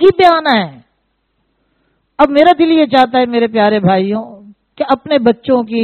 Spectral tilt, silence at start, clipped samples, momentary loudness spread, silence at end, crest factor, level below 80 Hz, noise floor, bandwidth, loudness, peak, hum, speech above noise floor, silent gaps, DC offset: -7.5 dB/octave; 0 s; 0.2%; 12 LU; 0 s; 12 dB; -48 dBFS; -64 dBFS; 8.6 kHz; -11 LUFS; 0 dBFS; none; 53 dB; none; under 0.1%